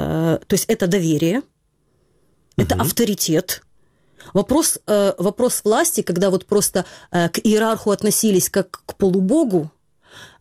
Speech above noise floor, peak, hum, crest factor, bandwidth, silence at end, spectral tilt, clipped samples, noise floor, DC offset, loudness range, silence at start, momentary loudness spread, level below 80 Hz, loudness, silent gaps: 45 dB; -4 dBFS; none; 14 dB; 16.5 kHz; 0.15 s; -4.5 dB/octave; under 0.1%; -64 dBFS; under 0.1%; 3 LU; 0 s; 7 LU; -46 dBFS; -18 LUFS; none